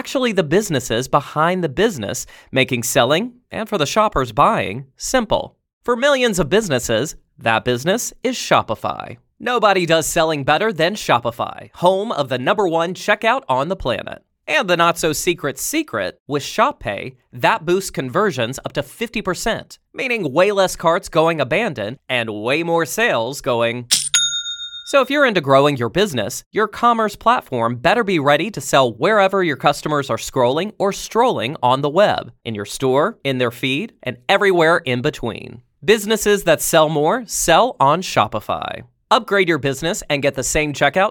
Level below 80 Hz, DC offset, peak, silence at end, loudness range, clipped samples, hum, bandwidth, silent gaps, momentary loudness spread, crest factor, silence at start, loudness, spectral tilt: -44 dBFS; under 0.1%; 0 dBFS; 0 s; 3 LU; under 0.1%; none; 19 kHz; 5.73-5.81 s, 16.20-16.26 s, 26.46-26.51 s; 10 LU; 18 dB; 0.05 s; -18 LUFS; -3.5 dB/octave